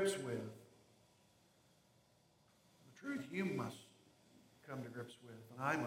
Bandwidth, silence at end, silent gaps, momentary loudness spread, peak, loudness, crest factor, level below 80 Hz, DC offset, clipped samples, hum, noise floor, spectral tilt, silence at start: 16.5 kHz; 0 s; none; 22 LU; -24 dBFS; -45 LUFS; 22 dB; -84 dBFS; under 0.1%; under 0.1%; none; -73 dBFS; -5 dB/octave; 0 s